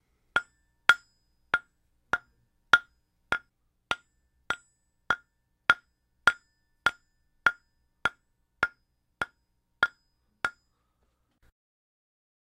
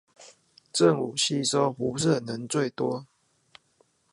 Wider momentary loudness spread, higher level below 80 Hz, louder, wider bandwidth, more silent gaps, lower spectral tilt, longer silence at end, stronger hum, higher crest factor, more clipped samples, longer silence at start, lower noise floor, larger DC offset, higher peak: first, 12 LU vs 8 LU; about the same, -62 dBFS vs -66 dBFS; second, -30 LUFS vs -26 LUFS; first, 15.5 kHz vs 11.5 kHz; neither; second, -1.5 dB/octave vs -4.5 dB/octave; first, 2 s vs 1.1 s; neither; first, 30 dB vs 20 dB; neither; first, 0.35 s vs 0.2 s; first, -75 dBFS vs -67 dBFS; neither; first, -2 dBFS vs -8 dBFS